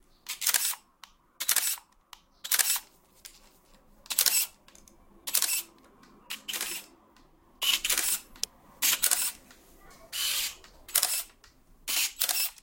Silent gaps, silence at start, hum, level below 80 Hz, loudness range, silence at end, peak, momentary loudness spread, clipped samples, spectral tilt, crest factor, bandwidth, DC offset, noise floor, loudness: none; 0.25 s; none; -62 dBFS; 3 LU; 0.1 s; -4 dBFS; 15 LU; under 0.1%; 3 dB/octave; 28 dB; 17 kHz; under 0.1%; -60 dBFS; -27 LUFS